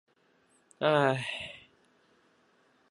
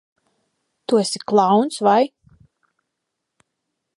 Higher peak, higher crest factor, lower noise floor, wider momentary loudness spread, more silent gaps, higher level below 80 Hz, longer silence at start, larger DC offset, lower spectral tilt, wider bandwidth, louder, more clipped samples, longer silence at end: second, -12 dBFS vs -2 dBFS; about the same, 24 dB vs 20 dB; second, -68 dBFS vs -79 dBFS; first, 18 LU vs 7 LU; neither; about the same, -74 dBFS vs -70 dBFS; about the same, 0.8 s vs 0.9 s; neither; about the same, -5.5 dB/octave vs -5 dB/octave; about the same, 11.5 kHz vs 11.5 kHz; second, -29 LUFS vs -18 LUFS; neither; second, 1.3 s vs 1.9 s